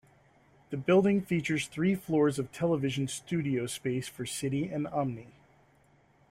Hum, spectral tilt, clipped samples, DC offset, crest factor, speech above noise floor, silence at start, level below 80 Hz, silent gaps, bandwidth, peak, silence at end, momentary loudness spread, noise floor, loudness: none; -6 dB/octave; under 0.1%; under 0.1%; 18 dB; 35 dB; 0.7 s; -66 dBFS; none; 16 kHz; -14 dBFS; 1.05 s; 10 LU; -64 dBFS; -30 LUFS